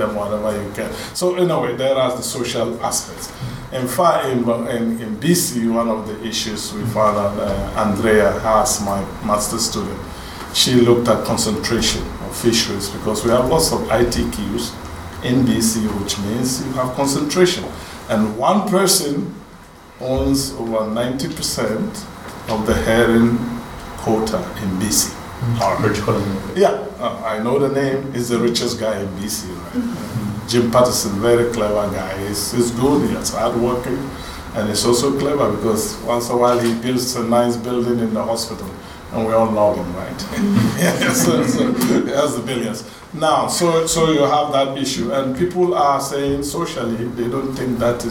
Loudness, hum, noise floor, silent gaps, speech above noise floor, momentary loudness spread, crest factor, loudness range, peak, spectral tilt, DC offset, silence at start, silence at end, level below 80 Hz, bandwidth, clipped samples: -18 LUFS; none; -40 dBFS; none; 23 dB; 10 LU; 18 dB; 3 LU; 0 dBFS; -4.5 dB/octave; under 0.1%; 0 s; 0 s; -38 dBFS; 19 kHz; under 0.1%